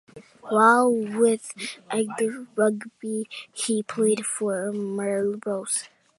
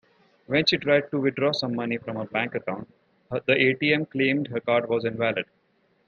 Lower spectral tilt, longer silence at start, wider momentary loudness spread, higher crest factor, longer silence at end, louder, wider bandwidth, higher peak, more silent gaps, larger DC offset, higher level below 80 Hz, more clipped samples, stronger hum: second, -4 dB/octave vs -6 dB/octave; second, 0.15 s vs 0.5 s; about the same, 13 LU vs 11 LU; about the same, 20 dB vs 20 dB; second, 0.3 s vs 0.65 s; about the same, -24 LUFS vs -24 LUFS; first, 11.5 kHz vs 7 kHz; about the same, -4 dBFS vs -6 dBFS; neither; neither; second, -78 dBFS vs -66 dBFS; neither; neither